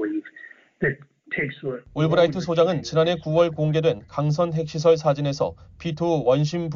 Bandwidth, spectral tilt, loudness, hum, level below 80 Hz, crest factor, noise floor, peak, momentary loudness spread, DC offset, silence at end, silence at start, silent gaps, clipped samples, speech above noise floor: 7.4 kHz; -6 dB/octave; -23 LUFS; none; -54 dBFS; 16 dB; -47 dBFS; -6 dBFS; 11 LU; under 0.1%; 0 s; 0 s; none; under 0.1%; 25 dB